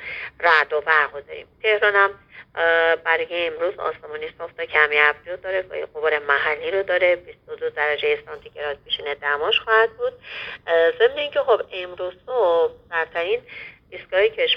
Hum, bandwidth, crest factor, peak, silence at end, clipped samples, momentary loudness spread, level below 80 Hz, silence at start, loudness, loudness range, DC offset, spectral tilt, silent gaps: none; 6.2 kHz; 22 dB; 0 dBFS; 0 s; under 0.1%; 15 LU; -60 dBFS; 0 s; -21 LUFS; 3 LU; under 0.1%; -4 dB/octave; none